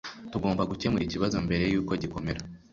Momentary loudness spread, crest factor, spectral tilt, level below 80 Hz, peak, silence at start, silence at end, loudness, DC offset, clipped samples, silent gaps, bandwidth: 8 LU; 16 dB; -6.5 dB/octave; -46 dBFS; -14 dBFS; 0.05 s; 0.15 s; -29 LUFS; under 0.1%; under 0.1%; none; 7.6 kHz